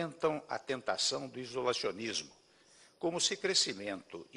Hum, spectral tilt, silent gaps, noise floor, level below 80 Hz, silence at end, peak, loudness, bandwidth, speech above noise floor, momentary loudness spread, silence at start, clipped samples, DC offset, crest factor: none; -2 dB/octave; none; -63 dBFS; -74 dBFS; 0 s; -14 dBFS; -34 LUFS; 12 kHz; 28 dB; 11 LU; 0 s; under 0.1%; under 0.1%; 22 dB